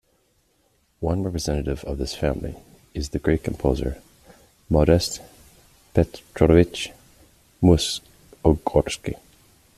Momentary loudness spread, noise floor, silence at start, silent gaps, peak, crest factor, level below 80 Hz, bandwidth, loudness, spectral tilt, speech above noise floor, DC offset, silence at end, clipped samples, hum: 15 LU; -65 dBFS; 1 s; none; -2 dBFS; 22 dB; -36 dBFS; 14 kHz; -23 LUFS; -6 dB/octave; 44 dB; under 0.1%; 0.6 s; under 0.1%; none